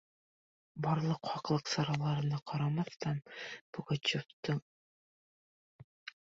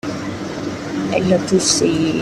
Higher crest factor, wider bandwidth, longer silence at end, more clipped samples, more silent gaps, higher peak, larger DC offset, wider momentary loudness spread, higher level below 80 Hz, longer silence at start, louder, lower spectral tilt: about the same, 18 dB vs 16 dB; second, 7.6 kHz vs 13 kHz; first, 0.2 s vs 0 s; neither; first, 2.42-2.46 s, 3.61-3.73 s, 4.33-4.43 s, 4.62-6.06 s vs none; second, -18 dBFS vs -2 dBFS; neither; about the same, 12 LU vs 11 LU; second, -72 dBFS vs -48 dBFS; first, 0.75 s vs 0.05 s; second, -36 LUFS vs -18 LUFS; about the same, -5 dB/octave vs -4 dB/octave